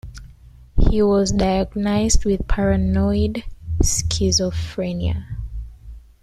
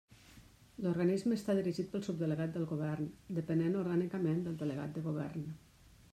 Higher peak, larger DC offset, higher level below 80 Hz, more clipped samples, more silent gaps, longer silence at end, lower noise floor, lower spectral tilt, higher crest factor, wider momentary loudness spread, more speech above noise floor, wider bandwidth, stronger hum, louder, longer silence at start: first, -2 dBFS vs -22 dBFS; neither; first, -26 dBFS vs -68 dBFS; neither; neither; second, 0.25 s vs 0.55 s; second, -44 dBFS vs -60 dBFS; second, -5 dB/octave vs -8 dB/octave; about the same, 18 dB vs 16 dB; first, 14 LU vs 8 LU; about the same, 26 dB vs 24 dB; about the same, 14 kHz vs 13.5 kHz; neither; first, -20 LUFS vs -36 LUFS; about the same, 0.05 s vs 0.1 s